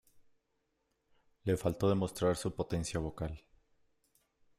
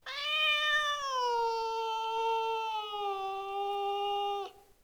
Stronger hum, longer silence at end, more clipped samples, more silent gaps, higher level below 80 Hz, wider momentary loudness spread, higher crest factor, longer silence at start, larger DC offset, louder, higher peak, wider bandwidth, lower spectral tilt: neither; first, 1.2 s vs 0.25 s; neither; neither; first, -56 dBFS vs -68 dBFS; about the same, 11 LU vs 9 LU; about the same, 18 dB vs 14 dB; about the same, 0.15 s vs 0.05 s; neither; second, -35 LUFS vs -32 LUFS; about the same, -18 dBFS vs -18 dBFS; second, 15.5 kHz vs over 20 kHz; first, -6 dB/octave vs 0 dB/octave